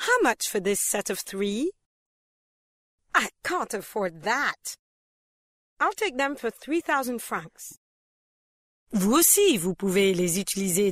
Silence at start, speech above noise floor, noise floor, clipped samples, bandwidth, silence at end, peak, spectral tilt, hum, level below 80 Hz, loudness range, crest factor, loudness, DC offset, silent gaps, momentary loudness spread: 0 s; over 65 dB; under -90 dBFS; under 0.1%; 16 kHz; 0 s; -6 dBFS; -3 dB/octave; none; -60 dBFS; 6 LU; 20 dB; -25 LUFS; under 0.1%; 1.86-2.98 s, 4.79-5.77 s, 7.77-8.86 s; 14 LU